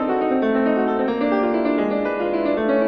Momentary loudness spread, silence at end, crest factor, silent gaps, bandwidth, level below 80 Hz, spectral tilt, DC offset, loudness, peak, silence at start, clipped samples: 3 LU; 0 s; 12 dB; none; 5.4 kHz; -52 dBFS; -8.5 dB/octave; under 0.1%; -20 LUFS; -8 dBFS; 0 s; under 0.1%